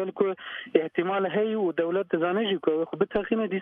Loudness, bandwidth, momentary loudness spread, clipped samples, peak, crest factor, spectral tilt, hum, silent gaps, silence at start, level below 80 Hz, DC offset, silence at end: -27 LUFS; 3.8 kHz; 2 LU; under 0.1%; -6 dBFS; 20 dB; -9 dB/octave; none; none; 0 s; -62 dBFS; under 0.1%; 0 s